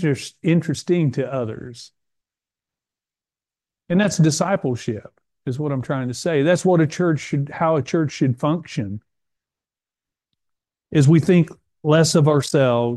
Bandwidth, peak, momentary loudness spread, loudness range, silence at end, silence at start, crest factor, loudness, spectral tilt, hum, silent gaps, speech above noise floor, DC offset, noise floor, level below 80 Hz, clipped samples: 12.5 kHz; -4 dBFS; 13 LU; 6 LU; 0 s; 0 s; 18 dB; -20 LUFS; -6 dB/octave; none; none; over 71 dB; under 0.1%; under -90 dBFS; -60 dBFS; under 0.1%